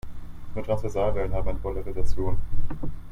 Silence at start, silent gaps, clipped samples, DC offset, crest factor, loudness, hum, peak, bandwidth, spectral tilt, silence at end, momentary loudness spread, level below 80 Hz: 0.05 s; none; under 0.1%; under 0.1%; 14 dB; -31 LUFS; none; -8 dBFS; 6.4 kHz; -8 dB/octave; 0 s; 11 LU; -30 dBFS